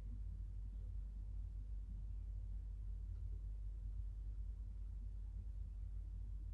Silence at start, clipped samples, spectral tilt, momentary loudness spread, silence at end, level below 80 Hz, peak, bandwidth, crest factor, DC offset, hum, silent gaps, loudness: 0 s; under 0.1%; -9 dB/octave; 1 LU; 0 s; -48 dBFS; -38 dBFS; 1.6 kHz; 10 dB; under 0.1%; none; none; -51 LUFS